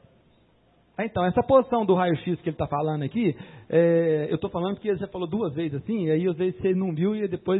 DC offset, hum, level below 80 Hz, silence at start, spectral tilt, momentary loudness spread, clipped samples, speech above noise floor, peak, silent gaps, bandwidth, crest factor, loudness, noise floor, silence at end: under 0.1%; none; -56 dBFS; 1 s; -12 dB/octave; 9 LU; under 0.1%; 37 dB; -6 dBFS; none; 4.1 kHz; 18 dB; -25 LUFS; -61 dBFS; 0 s